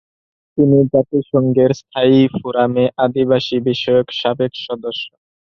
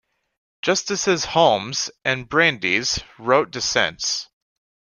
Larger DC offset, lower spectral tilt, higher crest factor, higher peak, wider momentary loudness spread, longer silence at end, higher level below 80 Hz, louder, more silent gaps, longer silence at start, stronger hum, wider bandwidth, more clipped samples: neither; first, -7.5 dB/octave vs -2.5 dB/octave; second, 14 dB vs 20 dB; about the same, -2 dBFS vs -2 dBFS; first, 11 LU vs 7 LU; second, 0.5 s vs 0.65 s; about the same, -54 dBFS vs -52 dBFS; first, -16 LUFS vs -20 LUFS; neither; about the same, 0.55 s vs 0.65 s; neither; second, 6.6 kHz vs 11 kHz; neither